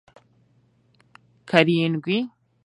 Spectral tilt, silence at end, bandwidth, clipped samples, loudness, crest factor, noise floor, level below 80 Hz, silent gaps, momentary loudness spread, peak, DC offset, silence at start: -7 dB/octave; 0.35 s; 11 kHz; under 0.1%; -21 LUFS; 24 dB; -62 dBFS; -72 dBFS; none; 8 LU; 0 dBFS; under 0.1%; 1.45 s